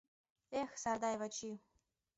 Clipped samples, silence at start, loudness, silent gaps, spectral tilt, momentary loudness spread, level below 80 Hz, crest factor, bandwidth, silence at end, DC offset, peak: under 0.1%; 0.5 s; -42 LUFS; none; -3 dB/octave; 10 LU; -76 dBFS; 18 dB; 8 kHz; 0.6 s; under 0.1%; -26 dBFS